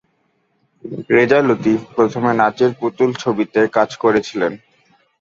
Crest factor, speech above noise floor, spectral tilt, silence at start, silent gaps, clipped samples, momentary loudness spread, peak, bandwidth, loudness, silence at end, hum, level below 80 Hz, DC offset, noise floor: 16 dB; 48 dB; -6.5 dB/octave; 0.85 s; none; under 0.1%; 8 LU; 0 dBFS; 7.6 kHz; -16 LUFS; 0.65 s; none; -58 dBFS; under 0.1%; -64 dBFS